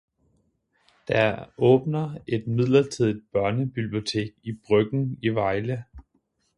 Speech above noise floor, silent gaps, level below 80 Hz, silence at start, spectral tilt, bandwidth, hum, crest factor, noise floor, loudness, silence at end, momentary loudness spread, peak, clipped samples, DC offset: 47 dB; none; -56 dBFS; 1.1 s; -7 dB/octave; 11 kHz; none; 18 dB; -70 dBFS; -24 LUFS; 0.55 s; 9 LU; -6 dBFS; under 0.1%; under 0.1%